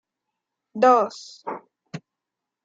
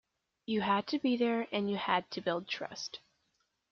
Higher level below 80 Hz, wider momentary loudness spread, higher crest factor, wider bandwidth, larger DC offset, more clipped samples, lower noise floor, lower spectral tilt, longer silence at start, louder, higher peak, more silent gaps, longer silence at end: second, -82 dBFS vs -76 dBFS; first, 23 LU vs 11 LU; about the same, 20 dB vs 20 dB; first, 7.8 kHz vs 7 kHz; neither; neither; first, -85 dBFS vs -79 dBFS; first, -5 dB/octave vs -3 dB/octave; first, 0.75 s vs 0.5 s; first, -19 LUFS vs -34 LUFS; first, -4 dBFS vs -16 dBFS; neither; about the same, 0.65 s vs 0.75 s